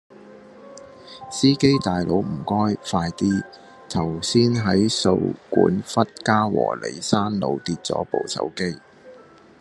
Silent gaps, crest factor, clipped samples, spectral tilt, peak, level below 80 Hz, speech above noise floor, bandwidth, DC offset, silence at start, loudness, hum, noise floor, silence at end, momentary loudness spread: none; 20 dB; under 0.1%; -5.5 dB/octave; -2 dBFS; -56 dBFS; 26 dB; 12 kHz; under 0.1%; 0.2 s; -22 LUFS; none; -47 dBFS; 0.45 s; 10 LU